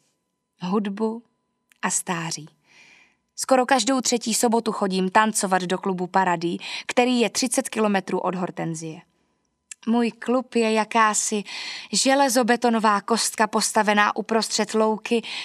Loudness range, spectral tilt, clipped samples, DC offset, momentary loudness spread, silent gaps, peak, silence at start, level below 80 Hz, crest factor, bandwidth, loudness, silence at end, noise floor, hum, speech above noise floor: 5 LU; -3 dB/octave; under 0.1%; under 0.1%; 11 LU; none; -2 dBFS; 0.6 s; -78 dBFS; 20 dB; 14.5 kHz; -22 LUFS; 0 s; -74 dBFS; none; 52 dB